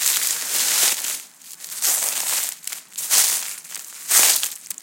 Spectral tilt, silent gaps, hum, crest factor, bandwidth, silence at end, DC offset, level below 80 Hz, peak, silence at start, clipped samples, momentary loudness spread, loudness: 3.5 dB/octave; none; none; 22 dB; 17.5 kHz; 0.1 s; under 0.1%; -80 dBFS; 0 dBFS; 0 s; under 0.1%; 17 LU; -18 LUFS